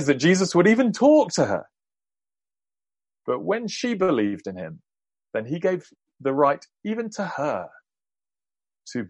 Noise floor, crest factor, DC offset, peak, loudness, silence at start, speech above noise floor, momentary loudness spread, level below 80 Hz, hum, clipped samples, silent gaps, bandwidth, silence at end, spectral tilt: under -90 dBFS; 20 dB; under 0.1%; -4 dBFS; -23 LUFS; 0 s; over 68 dB; 15 LU; -68 dBFS; none; under 0.1%; none; 11 kHz; 0 s; -5.5 dB/octave